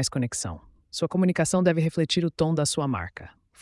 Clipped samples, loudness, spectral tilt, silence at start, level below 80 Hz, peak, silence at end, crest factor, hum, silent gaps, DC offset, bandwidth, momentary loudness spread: under 0.1%; -25 LUFS; -5 dB/octave; 0 s; -54 dBFS; -8 dBFS; 0.3 s; 16 dB; none; none; under 0.1%; 12 kHz; 14 LU